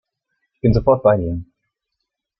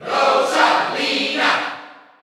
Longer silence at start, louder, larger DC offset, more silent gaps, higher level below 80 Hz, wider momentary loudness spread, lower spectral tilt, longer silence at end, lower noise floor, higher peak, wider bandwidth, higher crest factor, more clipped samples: first, 0.65 s vs 0 s; about the same, -17 LUFS vs -17 LUFS; neither; neither; first, -36 dBFS vs -70 dBFS; first, 12 LU vs 8 LU; first, -10.5 dB/octave vs -2 dB/octave; first, 0.95 s vs 0.3 s; first, -79 dBFS vs -38 dBFS; about the same, -2 dBFS vs -2 dBFS; second, 6 kHz vs 14 kHz; about the same, 18 dB vs 16 dB; neither